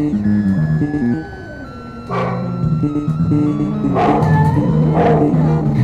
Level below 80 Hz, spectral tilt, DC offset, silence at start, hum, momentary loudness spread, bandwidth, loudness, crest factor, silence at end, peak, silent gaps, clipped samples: -36 dBFS; -9.5 dB/octave; under 0.1%; 0 s; none; 14 LU; 7.2 kHz; -16 LUFS; 14 dB; 0 s; 0 dBFS; none; under 0.1%